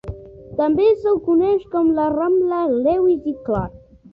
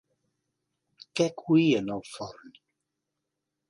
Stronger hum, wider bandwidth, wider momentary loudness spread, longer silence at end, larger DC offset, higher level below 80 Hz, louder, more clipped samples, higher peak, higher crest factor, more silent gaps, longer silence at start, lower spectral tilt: neither; second, 5.2 kHz vs 11.5 kHz; second, 10 LU vs 18 LU; second, 0.35 s vs 1.35 s; neither; first, -44 dBFS vs -70 dBFS; first, -18 LUFS vs -26 LUFS; neither; first, -6 dBFS vs -12 dBFS; second, 12 dB vs 20 dB; neither; second, 0.05 s vs 1.15 s; first, -10 dB/octave vs -6 dB/octave